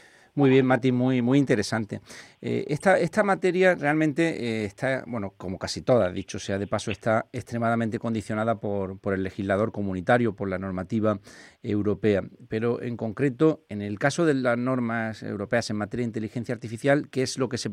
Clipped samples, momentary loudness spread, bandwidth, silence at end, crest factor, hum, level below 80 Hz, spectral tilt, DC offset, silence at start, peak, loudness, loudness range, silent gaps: under 0.1%; 11 LU; 13 kHz; 0 s; 20 dB; none; -60 dBFS; -6 dB/octave; under 0.1%; 0.35 s; -6 dBFS; -26 LUFS; 4 LU; none